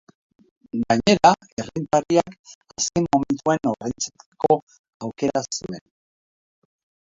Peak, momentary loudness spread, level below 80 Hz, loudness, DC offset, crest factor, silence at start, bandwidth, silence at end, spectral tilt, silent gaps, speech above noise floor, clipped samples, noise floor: 0 dBFS; 17 LU; -54 dBFS; -22 LUFS; under 0.1%; 22 dB; 0.75 s; 7.8 kHz; 1.4 s; -4.5 dB/octave; 1.52-1.57 s, 2.39-2.44 s, 2.55-2.61 s, 4.26-4.32 s, 4.62-4.67 s, 4.79-4.84 s, 4.94-5.00 s; over 68 dB; under 0.1%; under -90 dBFS